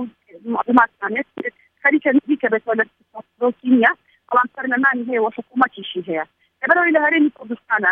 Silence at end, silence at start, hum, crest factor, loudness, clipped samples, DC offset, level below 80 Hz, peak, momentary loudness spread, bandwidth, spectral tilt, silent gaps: 0 s; 0 s; none; 18 dB; -18 LUFS; under 0.1%; under 0.1%; -68 dBFS; 0 dBFS; 13 LU; 4.1 kHz; -7.5 dB/octave; none